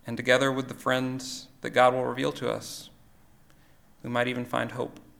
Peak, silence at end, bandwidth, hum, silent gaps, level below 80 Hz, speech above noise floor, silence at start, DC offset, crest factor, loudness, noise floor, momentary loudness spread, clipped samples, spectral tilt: -6 dBFS; 0.2 s; 19 kHz; none; none; -64 dBFS; 29 dB; 0.05 s; under 0.1%; 24 dB; -27 LUFS; -56 dBFS; 14 LU; under 0.1%; -4.5 dB/octave